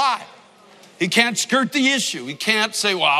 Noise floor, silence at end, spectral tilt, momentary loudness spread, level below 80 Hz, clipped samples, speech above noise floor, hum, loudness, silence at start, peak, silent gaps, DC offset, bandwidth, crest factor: -48 dBFS; 0 s; -2 dB/octave; 7 LU; -78 dBFS; under 0.1%; 29 dB; none; -19 LUFS; 0 s; 0 dBFS; none; under 0.1%; 15.5 kHz; 20 dB